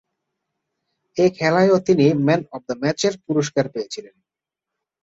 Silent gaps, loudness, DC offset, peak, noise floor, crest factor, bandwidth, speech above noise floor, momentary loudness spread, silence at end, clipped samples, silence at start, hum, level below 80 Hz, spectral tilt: none; -19 LUFS; under 0.1%; -4 dBFS; -85 dBFS; 18 dB; 8 kHz; 67 dB; 14 LU; 1.05 s; under 0.1%; 1.15 s; none; -60 dBFS; -6 dB/octave